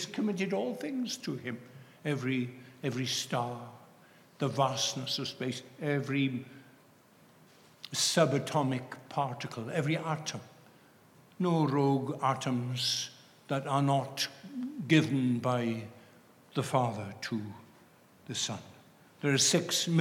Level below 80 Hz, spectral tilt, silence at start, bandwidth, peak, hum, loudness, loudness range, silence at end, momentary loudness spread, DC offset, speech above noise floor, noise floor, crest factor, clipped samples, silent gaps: -82 dBFS; -4.5 dB/octave; 0 s; 16.5 kHz; -12 dBFS; none; -32 LUFS; 5 LU; 0 s; 13 LU; under 0.1%; 29 dB; -61 dBFS; 22 dB; under 0.1%; none